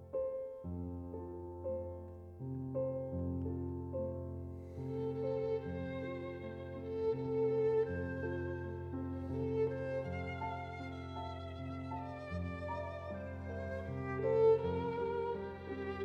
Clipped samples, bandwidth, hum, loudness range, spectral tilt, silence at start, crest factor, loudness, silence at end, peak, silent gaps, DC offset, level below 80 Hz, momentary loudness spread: under 0.1%; 6.6 kHz; none; 6 LU; -9 dB/octave; 0 s; 18 dB; -39 LUFS; 0 s; -20 dBFS; none; under 0.1%; -58 dBFS; 11 LU